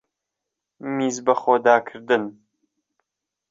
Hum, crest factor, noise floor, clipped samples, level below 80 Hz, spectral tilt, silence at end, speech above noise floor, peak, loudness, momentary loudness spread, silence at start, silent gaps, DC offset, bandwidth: none; 20 dB; -84 dBFS; under 0.1%; -70 dBFS; -4.5 dB/octave; 1.2 s; 63 dB; -4 dBFS; -21 LUFS; 14 LU; 0.85 s; none; under 0.1%; 7.8 kHz